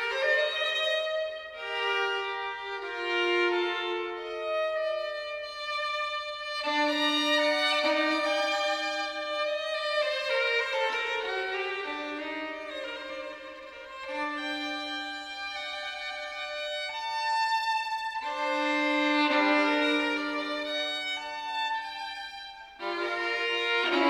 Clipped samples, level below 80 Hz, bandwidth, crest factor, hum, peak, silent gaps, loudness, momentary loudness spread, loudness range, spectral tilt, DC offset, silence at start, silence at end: under 0.1%; -70 dBFS; 15.5 kHz; 18 dB; none; -12 dBFS; none; -29 LUFS; 11 LU; 8 LU; -1 dB/octave; under 0.1%; 0 s; 0 s